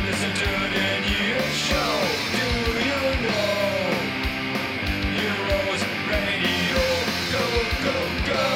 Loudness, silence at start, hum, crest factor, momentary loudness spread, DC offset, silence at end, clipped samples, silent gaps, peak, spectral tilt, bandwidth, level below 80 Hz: -23 LUFS; 0 s; none; 14 dB; 3 LU; under 0.1%; 0 s; under 0.1%; none; -10 dBFS; -4 dB/octave; 17.5 kHz; -36 dBFS